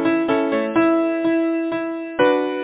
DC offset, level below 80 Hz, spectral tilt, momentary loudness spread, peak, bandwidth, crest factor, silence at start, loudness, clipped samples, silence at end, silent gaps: under 0.1%; -58 dBFS; -9.5 dB/octave; 6 LU; -4 dBFS; 4 kHz; 16 dB; 0 s; -19 LUFS; under 0.1%; 0 s; none